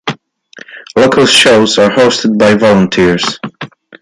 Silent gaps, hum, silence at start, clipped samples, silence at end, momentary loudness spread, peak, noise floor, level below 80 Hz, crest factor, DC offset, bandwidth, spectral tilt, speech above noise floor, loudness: none; none; 0.05 s; under 0.1%; 0.35 s; 19 LU; 0 dBFS; -37 dBFS; -42 dBFS; 10 dB; under 0.1%; 11.5 kHz; -4 dB/octave; 29 dB; -8 LUFS